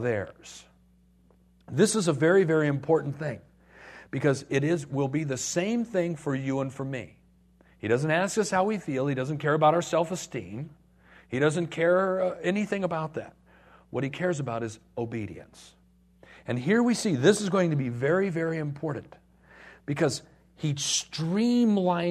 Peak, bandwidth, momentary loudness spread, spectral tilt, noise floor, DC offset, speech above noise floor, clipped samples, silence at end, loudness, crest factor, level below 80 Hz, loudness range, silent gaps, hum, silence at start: -8 dBFS; 13.5 kHz; 14 LU; -5.5 dB/octave; -61 dBFS; under 0.1%; 34 dB; under 0.1%; 0 s; -27 LUFS; 20 dB; -64 dBFS; 4 LU; none; none; 0 s